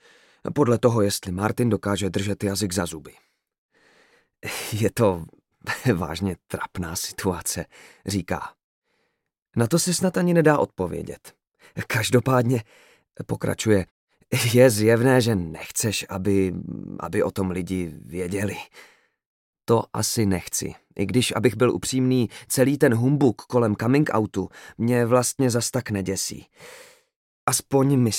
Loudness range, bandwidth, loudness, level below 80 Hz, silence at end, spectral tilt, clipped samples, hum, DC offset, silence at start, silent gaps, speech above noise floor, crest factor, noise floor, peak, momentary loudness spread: 7 LU; 17 kHz; -23 LUFS; -56 dBFS; 0 s; -5 dB/octave; under 0.1%; none; under 0.1%; 0.45 s; 3.58-3.69 s, 8.64-8.82 s, 13.91-14.07 s, 19.26-19.53 s, 27.16-27.47 s; 54 dB; 20 dB; -76 dBFS; -4 dBFS; 14 LU